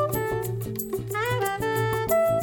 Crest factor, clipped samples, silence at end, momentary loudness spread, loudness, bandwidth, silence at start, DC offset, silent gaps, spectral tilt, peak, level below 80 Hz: 14 dB; under 0.1%; 0 s; 7 LU; -26 LUFS; 17.5 kHz; 0 s; under 0.1%; none; -5 dB/octave; -12 dBFS; -48 dBFS